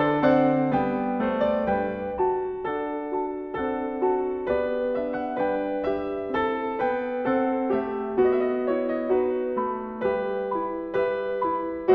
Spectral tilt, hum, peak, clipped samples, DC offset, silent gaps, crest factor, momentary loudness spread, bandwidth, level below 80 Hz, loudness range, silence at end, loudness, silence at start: -9 dB/octave; none; -8 dBFS; under 0.1%; under 0.1%; none; 16 dB; 7 LU; 5.2 kHz; -54 dBFS; 2 LU; 0 s; -26 LUFS; 0 s